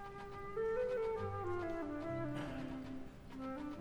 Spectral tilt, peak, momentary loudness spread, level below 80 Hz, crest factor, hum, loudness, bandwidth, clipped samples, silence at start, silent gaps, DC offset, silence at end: -7.5 dB/octave; -30 dBFS; 11 LU; -58 dBFS; 12 dB; none; -42 LUFS; 19 kHz; under 0.1%; 0 s; none; under 0.1%; 0 s